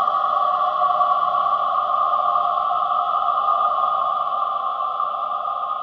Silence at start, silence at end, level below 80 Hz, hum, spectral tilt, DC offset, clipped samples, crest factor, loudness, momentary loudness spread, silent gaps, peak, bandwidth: 0 s; 0 s; -64 dBFS; none; -4 dB/octave; under 0.1%; under 0.1%; 14 dB; -20 LUFS; 5 LU; none; -6 dBFS; 5.8 kHz